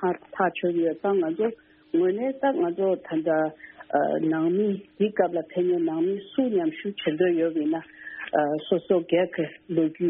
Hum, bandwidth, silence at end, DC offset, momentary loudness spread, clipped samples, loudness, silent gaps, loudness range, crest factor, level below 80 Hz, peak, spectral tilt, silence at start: none; 3.8 kHz; 0 s; under 0.1%; 5 LU; under 0.1%; -25 LUFS; none; 1 LU; 18 dB; -70 dBFS; -8 dBFS; -5.5 dB/octave; 0 s